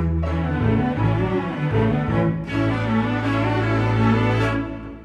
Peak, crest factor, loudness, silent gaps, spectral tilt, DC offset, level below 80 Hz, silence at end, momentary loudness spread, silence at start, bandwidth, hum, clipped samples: -6 dBFS; 14 dB; -21 LUFS; none; -8.5 dB/octave; under 0.1%; -34 dBFS; 0 s; 4 LU; 0 s; 7.6 kHz; none; under 0.1%